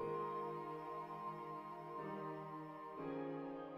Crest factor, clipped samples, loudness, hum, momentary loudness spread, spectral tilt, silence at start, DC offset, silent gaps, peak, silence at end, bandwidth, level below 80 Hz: 16 dB; under 0.1%; -48 LUFS; none; 6 LU; -8 dB/octave; 0 s; under 0.1%; none; -32 dBFS; 0 s; 15.5 kHz; -82 dBFS